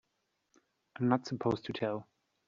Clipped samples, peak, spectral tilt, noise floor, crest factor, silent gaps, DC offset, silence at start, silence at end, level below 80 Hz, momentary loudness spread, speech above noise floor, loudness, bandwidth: under 0.1%; -12 dBFS; -6 dB/octave; -81 dBFS; 24 dB; none; under 0.1%; 1 s; 0.45 s; -72 dBFS; 6 LU; 48 dB; -35 LUFS; 7.4 kHz